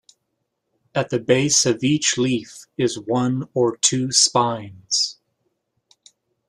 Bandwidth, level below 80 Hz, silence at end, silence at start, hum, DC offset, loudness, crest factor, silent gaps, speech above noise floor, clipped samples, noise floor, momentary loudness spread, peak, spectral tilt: 13 kHz; -60 dBFS; 1.35 s; 0.95 s; none; under 0.1%; -19 LUFS; 22 dB; none; 55 dB; under 0.1%; -76 dBFS; 10 LU; 0 dBFS; -3 dB/octave